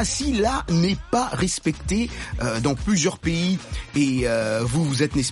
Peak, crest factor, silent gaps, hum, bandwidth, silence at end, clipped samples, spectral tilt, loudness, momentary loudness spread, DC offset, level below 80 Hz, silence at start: -8 dBFS; 14 dB; none; none; 11.5 kHz; 0 s; under 0.1%; -5 dB/octave; -23 LUFS; 4 LU; under 0.1%; -36 dBFS; 0 s